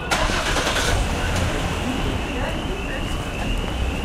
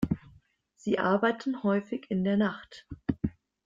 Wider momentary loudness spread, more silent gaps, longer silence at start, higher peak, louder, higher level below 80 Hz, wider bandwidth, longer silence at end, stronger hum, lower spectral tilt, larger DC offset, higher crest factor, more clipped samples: second, 6 LU vs 10 LU; neither; about the same, 0 s vs 0 s; first, -4 dBFS vs -12 dBFS; first, -23 LUFS vs -30 LUFS; first, -28 dBFS vs -54 dBFS; first, 16 kHz vs 7.6 kHz; second, 0 s vs 0.35 s; neither; second, -4 dB/octave vs -7.5 dB/octave; neither; about the same, 18 dB vs 18 dB; neither